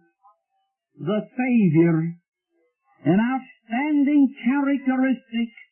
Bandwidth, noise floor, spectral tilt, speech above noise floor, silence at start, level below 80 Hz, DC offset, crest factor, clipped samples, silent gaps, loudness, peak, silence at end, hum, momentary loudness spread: 3.2 kHz; -75 dBFS; -12 dB/octave; 54 dB; 1 s; -68 dBFS; under 0.1%; 16 dB; under 0.1%; none; -22 LUFS; -8 dBFS; 0.2 s; none; 10 LU